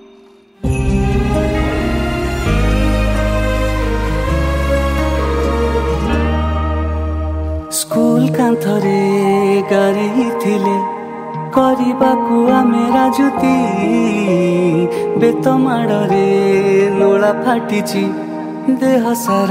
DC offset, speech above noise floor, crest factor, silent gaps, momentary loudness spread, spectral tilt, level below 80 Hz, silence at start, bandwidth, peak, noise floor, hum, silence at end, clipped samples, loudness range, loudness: under 0.1%; 31 dB; 14 dB; none; 6 LU; -6.5 dB/octave; -22 dBFS; 0.6 s; 16 kHz; 0 dBFS; -44 dBFS; none; 0 s; under 0.1%; 3 LU; -15 LUFS